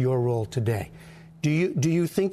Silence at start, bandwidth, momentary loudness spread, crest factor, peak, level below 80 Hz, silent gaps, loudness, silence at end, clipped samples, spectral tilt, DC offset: 0 s; 13.5 kHz; 7 LU; 14 dB; -10 dBFS; -56 dBFS; none; -26 LUFS; 0 s; under 0.1%; -7 dB/octave; under 0.1%